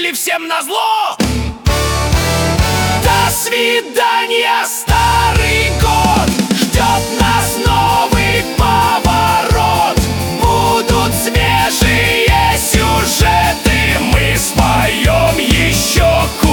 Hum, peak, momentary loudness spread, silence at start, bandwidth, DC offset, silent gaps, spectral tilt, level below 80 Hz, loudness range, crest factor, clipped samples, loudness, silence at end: none; 0 dBFS; 4 LU; 0 s; 19 kHz; under 0.1%; none; -4 dB/octave; -22 dBFS; 2 LU; 12 dB; under 0.1%; -12 LUFS; 0 s